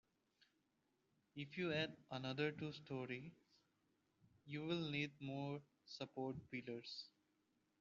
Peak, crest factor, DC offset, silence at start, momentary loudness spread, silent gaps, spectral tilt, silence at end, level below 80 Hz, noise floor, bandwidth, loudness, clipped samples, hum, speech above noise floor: -28 dBFS; 20 dB; under 0.1%; 1.35 s; 11 LU; none; -4 dB/octave; 0.7 s; -82 dBFS; -85 dBFS; 7.2 kHz; -47 LUFS; under 0.1%; none; 37 dB